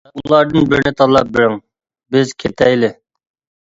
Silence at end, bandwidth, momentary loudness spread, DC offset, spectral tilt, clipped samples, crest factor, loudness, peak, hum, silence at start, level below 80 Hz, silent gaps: 0.7 s; 7.8 kHz; 7 LU; under 0.1%; -6 dB/octave; under 0.1%; 14 dB; -14 LUFS; 0 dBFS; none; 0.15 s; -44 dBFS; none